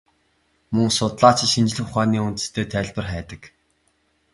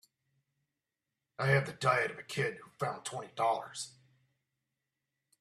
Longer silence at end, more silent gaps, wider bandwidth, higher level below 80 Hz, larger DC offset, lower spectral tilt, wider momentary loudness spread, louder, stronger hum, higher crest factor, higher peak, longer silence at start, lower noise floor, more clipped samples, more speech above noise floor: second, 0.85 s vs 1.5 s; neither; second, 11.5 kHz vs 13.5 kHz; first, -46 dBFS vs -74 dBFS; neither; about the same, -4.5 dB/octave vs -4.5 dB/octave; about the same, 15 LU vs 13 LU; first, -20 LUFS vs -34 LUFS; neither; about the same, 22 dB vs 22 dB; first, 0 dBFS vs -14 dBFS; second, 0.7 s vs 1.4 s; second, -66 dBFS vs -89 dBFS; neither; second, 45 dB vs 55 dB